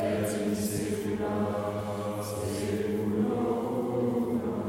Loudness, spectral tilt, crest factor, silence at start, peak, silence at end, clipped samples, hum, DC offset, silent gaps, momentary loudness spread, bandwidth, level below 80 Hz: -30 LUFS; -6 dB/octave; 12 dB; 0 s; -16 dBFS; 0 s; under 0.1%; none; under 0.1%; none; 5 LU; 16 kHz; -56 dBFS